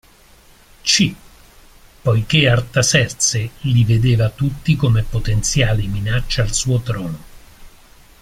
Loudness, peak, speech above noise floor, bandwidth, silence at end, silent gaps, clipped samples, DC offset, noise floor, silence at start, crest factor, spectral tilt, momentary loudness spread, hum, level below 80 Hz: -17 LUFS; 0 dBFS; 31 dB; 15.5 kHz; 0.55 s; none; under 0.1%; under 0.1%; -48 dBFS; 0.85 s; 16 dB; -4 dB/octave; 8 LU; none; -32 dBFS